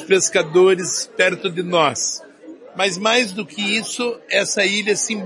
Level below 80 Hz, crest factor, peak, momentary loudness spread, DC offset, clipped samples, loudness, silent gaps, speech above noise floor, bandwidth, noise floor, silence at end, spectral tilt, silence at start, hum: -70 dBFS; 18 dB; -2 dBFS; 9 LU; under 0.1%; under 0.1%; -18 LUFS; none; 22 dB; 11.5 kHz; -40 dBFS; 0 s; -2.5 dB/octave; 0 s; none